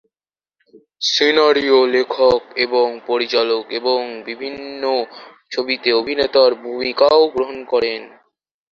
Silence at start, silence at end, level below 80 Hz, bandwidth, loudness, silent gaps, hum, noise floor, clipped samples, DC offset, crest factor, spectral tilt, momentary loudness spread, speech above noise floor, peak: 1 s; 0.65 s; -56 dBFS; 7.2 kHz; -17 LUFS; none; none; under -90 dBFS; under 0.1%; under 0.1%; 16 dB; -3 dB/octave; 14 LU; over 73 dB; -2 dBFS